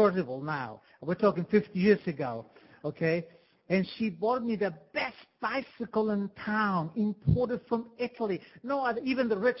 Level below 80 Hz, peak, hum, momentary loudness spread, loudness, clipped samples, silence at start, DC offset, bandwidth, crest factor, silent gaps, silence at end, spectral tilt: -54 dBFS; -10 dBFS; none; 10 LU; -31 LUFS; under 0.1%; 0 s; under 0.1%; 5.8 kHz; 20 dB; none; 0 s; -10.5 dB/octave